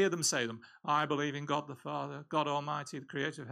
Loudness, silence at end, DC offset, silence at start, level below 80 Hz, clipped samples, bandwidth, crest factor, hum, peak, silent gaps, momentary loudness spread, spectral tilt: -35 LUFS; 0 s; under 0.1%; 0 s; -82 dBFS; under 0.1%; 15.5 kHz; 16 dB; none; -18 dBFS; none; 9 LU; -3.5 dB/octave